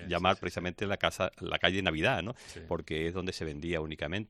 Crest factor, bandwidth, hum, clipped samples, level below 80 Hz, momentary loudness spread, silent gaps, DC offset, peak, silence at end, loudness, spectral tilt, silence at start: 26 dB; 14.5 kHz; none; under 0.1%; -52 dBFS; 9 LU; none; under 0.1%; -8 dBFS; 0.05 s; -32 LUFS; -5 dB/octave; 0 s